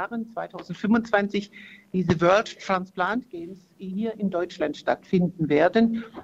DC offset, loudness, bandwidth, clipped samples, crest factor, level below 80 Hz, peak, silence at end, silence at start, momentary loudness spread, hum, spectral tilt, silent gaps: under 0.1%; -25 LUFS; 8 kHz; under 0.1%; 20 dB; -58 dBFS; -6 dBFS; 0 s; 0 s; 16 LU; none; -7 dB/octave; none